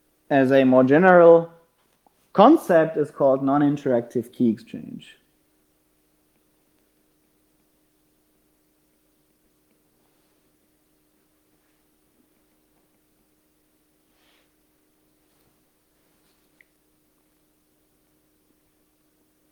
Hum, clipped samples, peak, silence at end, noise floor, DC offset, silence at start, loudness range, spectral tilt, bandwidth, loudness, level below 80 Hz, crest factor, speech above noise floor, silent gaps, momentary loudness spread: none; under 0.1%; 0 dBFS; 14.55 s; -66 dBFS; under 0.1%; 0.3 s; 15 LU; -8 dB/octave; 15 kHz; -18 LUFS; -72 dBFS; 24 dB; 48 dB; none; 22 LU